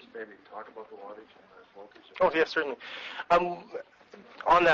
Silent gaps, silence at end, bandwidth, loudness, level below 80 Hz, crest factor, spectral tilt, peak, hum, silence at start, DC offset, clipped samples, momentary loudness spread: none; 0 s; 7.6 kHz; -28 LUFS; -60 dBFS; 20 dB; -5 dB/octave; -10 dBFS; none; 0.15 s; under 0.1%; under 0.1%; 25 LU